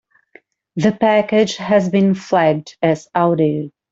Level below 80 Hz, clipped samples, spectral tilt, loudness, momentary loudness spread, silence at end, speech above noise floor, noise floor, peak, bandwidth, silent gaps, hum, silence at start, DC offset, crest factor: -58 dBFS; under 0.1%; -6.5 dB/octave; -16 LUFS; 5 LU; 0.2 s; 35 dB; -50 dBFS; -2 dBFS; 7.8 kHz; none; none; 0.75 s; under 0.1%; 14 dB